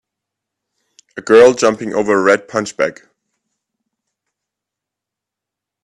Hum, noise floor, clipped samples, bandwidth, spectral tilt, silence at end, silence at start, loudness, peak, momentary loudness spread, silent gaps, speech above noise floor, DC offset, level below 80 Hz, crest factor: none; -84 dBFS; under 0.1%; 11 kHz; -4 dB/octave; 2.9 s; 1.15 s; -13 LUFS; 0 dBFS; 13 LU; none; 71 dB; under 0.1%; -60 dBFS; 18 dB